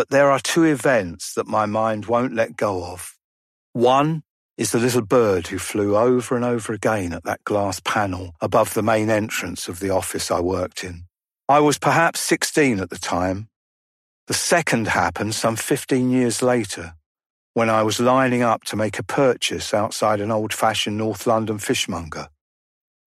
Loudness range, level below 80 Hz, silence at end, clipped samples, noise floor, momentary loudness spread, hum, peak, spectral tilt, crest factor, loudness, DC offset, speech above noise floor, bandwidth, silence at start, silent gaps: 2 LU; -54 dBFS; 0.8 s; under 0.1%; under -90 dBFS; 10 LU; none; -4 dBFS; -4.5 dB/octave; 18 dB; -20 LUFS; under 0.1%; over 70 dB; 15 kHz; 0 s; 3.24-3.73 s, 4.30-4.49 s, 13.56-14.27 s, 17.06-17.15 s, 17.26-17.54 s